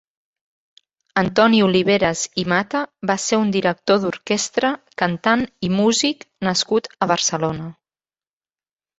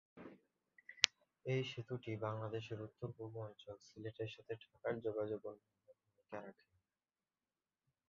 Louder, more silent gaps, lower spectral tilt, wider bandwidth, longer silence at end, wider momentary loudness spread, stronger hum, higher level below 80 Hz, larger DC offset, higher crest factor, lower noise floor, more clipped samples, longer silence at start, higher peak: first, -19 LUFS vs -44 LUFS; neither; about the same, -4 dB/octave vs -3.5 dB/octave; first, 8.2 kHz vs 7.2 kHz; second, 1.25 s vs 1.6 s; second, 8 LU vs 23 LU; neither; first, -54 dBFS vs -80 dBFS; neither; second, 18 dB vs 42 dB; about the same, under -90 dBFS vs under -90 dBFS; neither; first, 1.15 s vs 0.15 s; about the same, -2 dBFS vs -4 dBFS